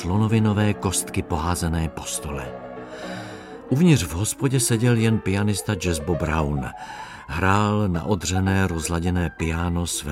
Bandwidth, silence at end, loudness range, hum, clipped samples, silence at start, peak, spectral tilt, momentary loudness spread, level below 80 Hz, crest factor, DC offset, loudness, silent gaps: 16 kHz; 0 s; 3 LU; none; under 0.1%; 0 s; -4 dBFS; -5.5 dB/octave; 15 LU; -38 dBFS; 18 dB; under 0.1%; -22 LUFS; none